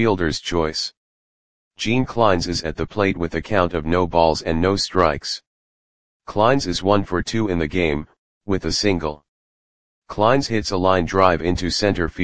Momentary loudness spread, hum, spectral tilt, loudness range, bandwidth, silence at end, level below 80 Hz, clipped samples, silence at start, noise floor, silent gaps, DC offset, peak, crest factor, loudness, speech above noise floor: 9 LU; none; -5 dB/octave; 2 LU; 10 kHz; 0 s; -40 dBFS; under 0.1%; 0 s; under -90 dBFS; 0.97-1.71 s, 5.47-6.20 s, 8.18-8.41 s, 9.28-10.02 s; 2%; 0 dBFS; 20 dB; -20 LUFS; over 71 dB